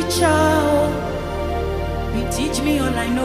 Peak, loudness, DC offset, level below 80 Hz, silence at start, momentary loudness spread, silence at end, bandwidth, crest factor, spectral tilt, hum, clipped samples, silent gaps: -4 dBFS; -20 LUFS; under 0.1%; -30 dBFS; 0 s; 9 LU; 0 s; 15.5 kHz; 16 dB; -5 dB/octave; none; under 0.1%; none